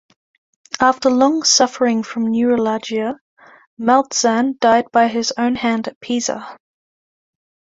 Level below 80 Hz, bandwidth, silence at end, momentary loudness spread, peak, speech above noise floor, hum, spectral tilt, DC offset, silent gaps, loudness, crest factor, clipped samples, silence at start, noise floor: -60 dBFS; 7.8 kHz; 1.2 s; 10 LU; 0 dBFS; over 74 dB; none; -2.5 dB/octave; under 0.1%; 3.21-3.37 s, 3.67-3.77 s, 5.96-6.01 s; -17 LUFS; 18 dB; under 0.1%; 0.75 s; under -90 dBFS